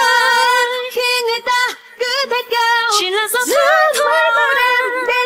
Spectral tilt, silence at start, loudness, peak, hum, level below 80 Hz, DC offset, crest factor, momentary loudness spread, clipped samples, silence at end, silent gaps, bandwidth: 1.5 dB/octave; 0 s; -14 LUFS; 0 dBFS; none; -64 dBFS; under 0.1%; 14 dB; 6 LU; under 0.1%; 0 s; none; 16.5 kHz